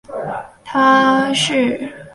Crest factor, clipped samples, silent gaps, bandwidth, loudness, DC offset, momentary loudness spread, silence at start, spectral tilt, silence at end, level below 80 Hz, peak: 16 dB; under 0.1%; none; 11.5 kHz; -15 LUFS; under 0.1%; 15 LU; 0.1 s; -3.5 dB/octave; 0.05 s; -56 dBFS; 0 dBFS